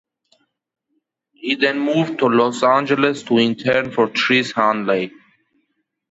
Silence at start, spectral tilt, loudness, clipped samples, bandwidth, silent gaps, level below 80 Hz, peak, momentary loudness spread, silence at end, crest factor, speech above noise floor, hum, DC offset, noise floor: 1.45 s; -5 dB/octave; -17 LUFS; under 0.1%; 8 kHz; none; -62 dBFS; -2 dBFS; 6 LU; 1.05 s; 16 dB; 54 dB; none; under 0.1%; -71 dBFS